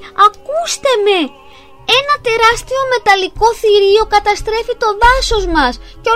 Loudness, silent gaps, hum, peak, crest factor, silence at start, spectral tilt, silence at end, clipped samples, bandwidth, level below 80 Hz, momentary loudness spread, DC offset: -12 LUFS; none; none; 0 dBFS; 12 dB; 0 s; -2.5 dB/octave; 0 s; under 0.1%; 15.5 kHz; -28 dBFS; 7 LU; 0.7%